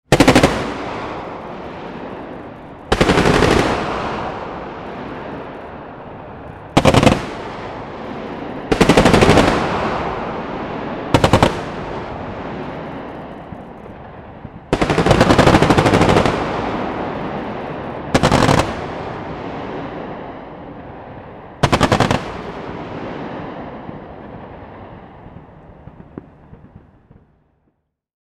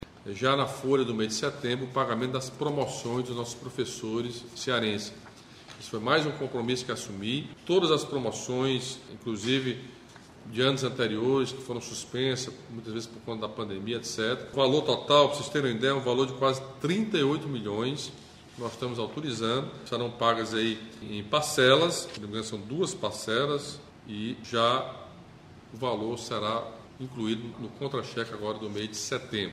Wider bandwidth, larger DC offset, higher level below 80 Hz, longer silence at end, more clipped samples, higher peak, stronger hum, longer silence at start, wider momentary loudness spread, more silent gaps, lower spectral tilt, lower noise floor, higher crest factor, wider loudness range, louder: first, 16 kHz vs 14.5 kHz; neither; first, -32 dBFS vs -64 dBFS; first, 1.45 s vs 0 s; neither; first, 0 dBFS vs -6 dBFS; neither; about the same, 0.1 s vs 0 s; first, 23 LU vs 13 LU; neither; about the same, -5.5 dB/octave vs -4.5 dB/octave; first, -66 dBFS vs -50 dBFS; second, 18 dB vs 24 dB; first, 14 LU vs 6 LU; first, -17 LUFS vs -29 LUFS